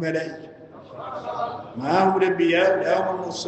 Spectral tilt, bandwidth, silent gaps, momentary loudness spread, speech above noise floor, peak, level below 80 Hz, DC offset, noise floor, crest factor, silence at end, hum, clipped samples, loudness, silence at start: -5.5 dB/octave; 8.6 kHz; none; 19 LU; 20 dB; -6 dBFS; -68 dBFS; under 0.1%; -42 dBFS; 16 dB; 0 s; none; under 0.1%; -22 LUFS; 0 s